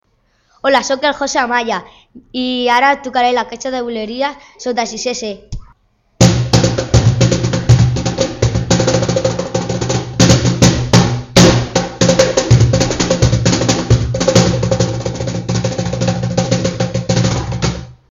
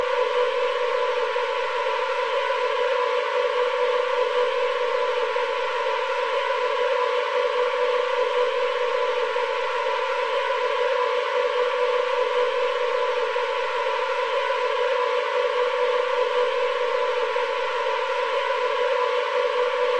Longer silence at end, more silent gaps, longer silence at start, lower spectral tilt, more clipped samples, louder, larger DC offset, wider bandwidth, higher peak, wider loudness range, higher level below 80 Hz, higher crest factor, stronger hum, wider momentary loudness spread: first, 0.2 s vs 0 s; neither; first, 0.65 s vs 0 s; first, -5 dB/octave vs 0 dB/octave; neither; first, -14 LUFS vs -23 LUFS; second, under 0.1% vs 0.6%; first, 11.5 kHz vs 9.4 kHz; first, 0 dBFS vs -10 dBFS; first, 5 LU vs 1 LU; first, -28 dBFS vs -70 dBFS; about the same, 14 dB vs 12 dB; neither; first, 10 LU vs 2 LU